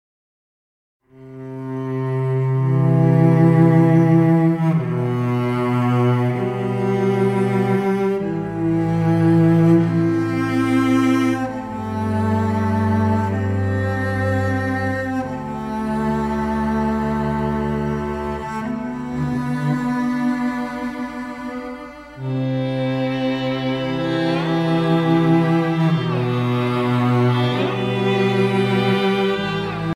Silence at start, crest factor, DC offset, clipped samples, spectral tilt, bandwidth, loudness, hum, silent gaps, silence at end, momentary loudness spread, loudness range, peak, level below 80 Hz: 1.15 s; 14 dB; under 0.1%; under 0.1%; -8 dB/octave; 12 kHz; -19 LUFS; none; none; 0 s; 11 LU; 7 LU; -4 dBFS; -44 dBFS